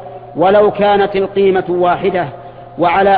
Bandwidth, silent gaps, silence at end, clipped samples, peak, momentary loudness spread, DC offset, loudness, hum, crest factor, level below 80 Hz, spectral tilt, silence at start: 4.9 kHz; none; 0 s; under 0.1%; 0 dBFS; 15 LU; under 0.1%; -13 LUFS; none; 12 dB; -44 dBFS; -9.5 dB/octave; 0 s